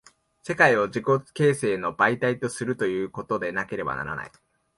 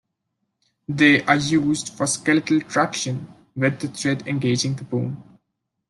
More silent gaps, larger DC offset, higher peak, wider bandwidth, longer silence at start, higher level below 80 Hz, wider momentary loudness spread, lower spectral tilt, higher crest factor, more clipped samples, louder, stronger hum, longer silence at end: neither; neither; about the same, -4 dBFS vs -2 dBFS; about the same, 11.5 kHz vs 12 kHz; second, 0.45 s vs 0.9 s; about the same, -60 dBFS vs -60 dBFS; about the same, 13 LU vs 14 LU; about the same, -5.5 dB/octave vs -4.5 dB/octave; about the same, 22 dB vs 20 dB; neither; second, -24 LUFS vs -21 LUFS; neither; second, 0.5 s vs 0.7 s